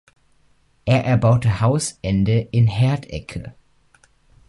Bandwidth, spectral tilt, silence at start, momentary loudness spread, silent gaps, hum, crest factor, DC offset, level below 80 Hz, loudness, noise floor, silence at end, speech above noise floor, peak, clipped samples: 11.5 kHz; -6.5 dB/octave; 0.85 s; 15 LU; none; none; 16 dB; under 0.1%; -42 dBFS; -19 LUFS; -58 dBFS; 1 s; 40 dB; -4 dBFS; under 0.1%